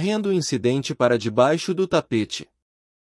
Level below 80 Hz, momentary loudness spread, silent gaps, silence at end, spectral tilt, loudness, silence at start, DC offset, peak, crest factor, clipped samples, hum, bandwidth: -62 dBFS; 6 LU; none; 0.75 s; -5.5 dB/octave; -22 LUFS; 0 s; under 0.1%; -4 dBFS; 18 dB; under 0.1%; none; 12 kHz